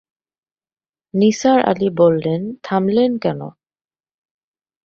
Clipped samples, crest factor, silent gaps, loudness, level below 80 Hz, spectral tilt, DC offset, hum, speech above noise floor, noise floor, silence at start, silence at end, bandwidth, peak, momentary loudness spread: under 0.1%; 18 dB; none; -17 LUFS; -58 dBFS; -6.5 dB/octave; under 0.1%; none; over 74 dB; under -90 dBFS; 1.15 s; 1.35 s; 7.6 kHz; -2 dBFS; 10 LU